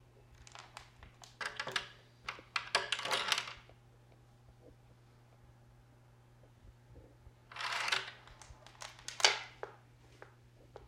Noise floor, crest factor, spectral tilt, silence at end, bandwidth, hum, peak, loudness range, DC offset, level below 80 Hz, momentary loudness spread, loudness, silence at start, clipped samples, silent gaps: -63 dBFS; 38 dB; -0.5 dB/octave; 0 s; 16 kHz; none; -4 dBFS; 6 LU; under 0.1%; -68 dBFS; 27 LU; -36 LUFS; 0.15 s; under 0.1%; none